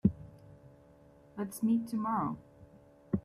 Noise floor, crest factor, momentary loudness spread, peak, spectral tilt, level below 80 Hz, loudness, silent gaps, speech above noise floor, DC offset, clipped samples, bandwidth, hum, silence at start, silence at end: -59 dBFS; 22 dB; 23 LU; -14 dBFS; -8 dB/octave; -60 dBFS; -34 LUFS; none; 27 dB; under 0.1%; under 0.1%; 14 kHz; none; 0.05 s; 0.05 s